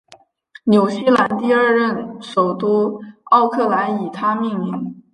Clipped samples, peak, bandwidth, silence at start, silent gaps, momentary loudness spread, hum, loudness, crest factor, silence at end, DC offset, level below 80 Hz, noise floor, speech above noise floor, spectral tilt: under 0.1%; -2 dBFS; 11 kHz; 0.1 s; none; 10 LU; none; -17 LUFS; 16 dB; 0.15 s; under 0.1%; -64 dBFS; -50 dBFS; 33 dB; -7 dB/octave